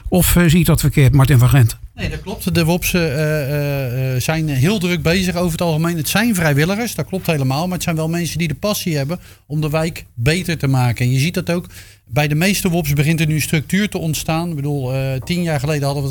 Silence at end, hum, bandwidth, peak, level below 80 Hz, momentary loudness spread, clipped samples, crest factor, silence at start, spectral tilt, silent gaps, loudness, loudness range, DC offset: 0 s; none; 19.5 kHz; -2 dBFS; -32 dBFS; 9 LU; under 0.1%; 14 dB; 0.05 s; -5.5 dB/octave; none; -17 LUFS; 4 LU; under 0.1%